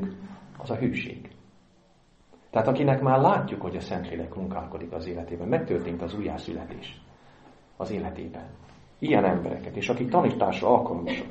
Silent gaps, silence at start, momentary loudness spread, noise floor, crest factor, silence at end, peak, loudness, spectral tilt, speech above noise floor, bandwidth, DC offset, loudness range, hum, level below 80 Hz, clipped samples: none; 0 s; 18 LU; -60 dBFS; 24 dB; 0 s; -4 dBFS; -27 LUFS; -8 dB/octave; 33 dB; 8.2 kHz; under 0.1%; 7 LU; none; -54 dBFS; under 0.1%